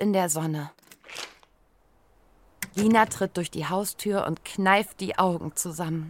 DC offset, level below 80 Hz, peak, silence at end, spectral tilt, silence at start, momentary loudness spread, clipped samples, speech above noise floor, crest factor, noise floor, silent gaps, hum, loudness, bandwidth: under 0.1%; -62 dBFS; -6 dBFS; 0 s; -4.5 dB/octave; 0 s; 16 LU; under 0.1%; 37 dB; 22 dB; -63 dBFS; none; none; -26 LUFS; 17 kHz